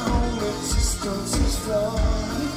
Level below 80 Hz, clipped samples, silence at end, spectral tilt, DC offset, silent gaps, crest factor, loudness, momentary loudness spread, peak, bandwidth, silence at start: -26 dBFS; under 0.1%; 0 s; -4.5 dB/octave; under 0.1%; none; 14 dB; -24 LUFS; 2 LU; -8 dBFS; 16 kHz; 0 s